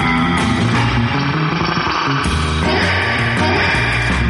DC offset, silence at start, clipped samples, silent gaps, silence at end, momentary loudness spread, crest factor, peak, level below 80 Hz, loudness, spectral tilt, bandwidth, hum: under 0.1%; 0 s; under 0.1%; none; 0 s; 3 LU; 10 dB; -4 dBFS; -28 dBFS; -15 LUFS; -5.5 dB/octave; 11.5 kHz; none